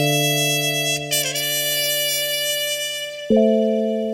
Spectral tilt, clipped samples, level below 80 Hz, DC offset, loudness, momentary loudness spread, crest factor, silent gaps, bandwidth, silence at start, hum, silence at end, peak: -2.5 dB/octave; under 0.1%; -58 dBFS; under 0.1%; -19 LUFS; 4 LU; 16 dB; none; over 20 kHz; 0 s; none; 0 s; -4 dBFS